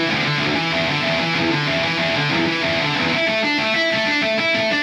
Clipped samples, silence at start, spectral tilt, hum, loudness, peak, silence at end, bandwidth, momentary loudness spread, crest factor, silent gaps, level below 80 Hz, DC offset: under 0.1%; 0 s; -4.5 dB/octave; none; -18 LUFS; -8 dBFS; 0 s; 15 kHz; 1 LU; 12 dB; none; -52 dBFS; under 0.1%